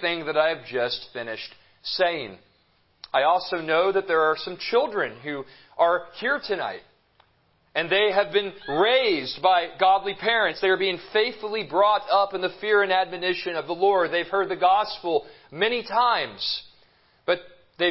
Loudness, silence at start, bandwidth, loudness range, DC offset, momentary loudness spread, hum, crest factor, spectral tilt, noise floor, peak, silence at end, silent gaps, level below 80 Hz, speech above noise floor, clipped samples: -24 LUFS; 0 s; 5.8 kHz; 4 LU; under 0.1%; 11 LU; none; 20 dB; -7.5 dB/octave; -65 dBFS; -6 dBFS; 0 s; none; -66 dBFS; 41 dB; under 0.1%